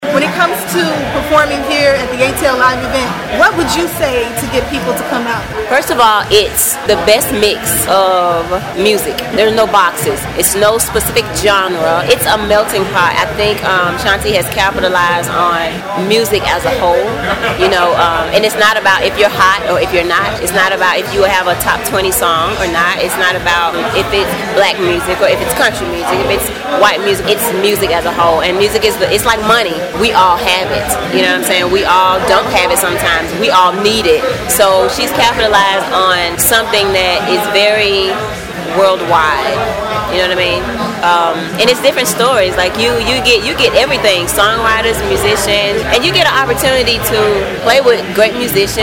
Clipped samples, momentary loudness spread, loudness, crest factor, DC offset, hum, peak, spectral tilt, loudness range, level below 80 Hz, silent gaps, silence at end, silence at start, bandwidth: under 0.1%; 5 LU; -11 LUFS; 12 dB; under 0.1%; none; 0 dBFS; -3 dB/octave; 2 LU; -32 dBFS; none; 0 s; 0 s; 18 kHz